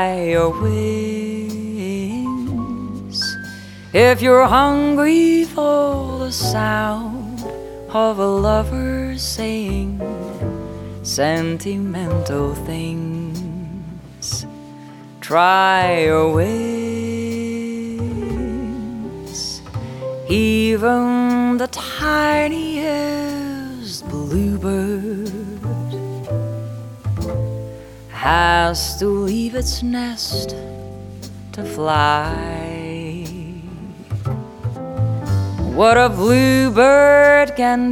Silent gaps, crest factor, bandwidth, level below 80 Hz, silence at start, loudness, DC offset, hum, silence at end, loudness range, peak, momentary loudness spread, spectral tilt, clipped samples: none; 18 dB; 18 kHz; -36 dBFS; 0 s; -18 LUFS; under 0.1%; none; 0 s; 9 LU; 0 dBFS; 17 LU; -5.5 dB/octave; under 0.1%